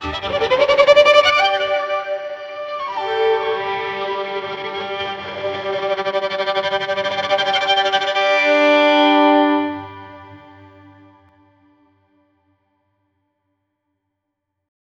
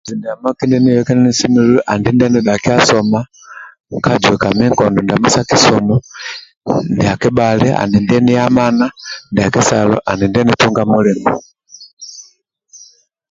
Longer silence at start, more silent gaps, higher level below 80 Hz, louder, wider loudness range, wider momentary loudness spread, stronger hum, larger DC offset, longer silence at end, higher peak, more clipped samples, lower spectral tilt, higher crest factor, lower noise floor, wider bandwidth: about the same, 0 s vs 0.05 s; second, none vs 3.80-3.84 s, 6.57-6.61 s, 11.93-11.97 s; second, -52 dBFS vs -42 dBFS; second, -17 LUFS vs -12 LUFS; first, 7 LU vs 2 LU; about the same, 14 LU vs 15 LU; neither; neither; first, 4.35 s vs 0.55 s; about the same, 0 dBFS vs 0 dBFS; neither; second, -3.5 dB/octave vs -5 dB/octave; first, 18 dB vs 12 dB; first, -77 dBFS vs -51 dBFS; about the same, 7.8 kHz vs 7.8 kHz